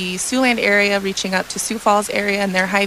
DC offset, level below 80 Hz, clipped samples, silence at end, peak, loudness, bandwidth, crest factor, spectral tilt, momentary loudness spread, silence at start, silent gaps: 0.1%; -52 dBFS; under 0.1%; 0 s; -4 dBFS; -17 LUFS; 15.5 kHz; 14 dB; -3 dB/octave; 6 LU; 0 s; none